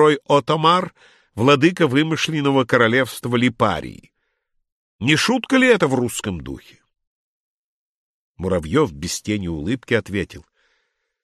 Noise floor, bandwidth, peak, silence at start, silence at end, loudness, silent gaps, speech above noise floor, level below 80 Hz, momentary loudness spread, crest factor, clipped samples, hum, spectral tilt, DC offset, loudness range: -71 dBFS; 13 kHz; -2 dBFS; 0 s; 0.8 s; -19 LUFS; 4.72-4.99 s, 7.07-8.35 s; 52 dB; -48 dBFS; 13 LU; 18 dB; under 0.1%; none; -5 dB/octave; under 0.1%; 8 LU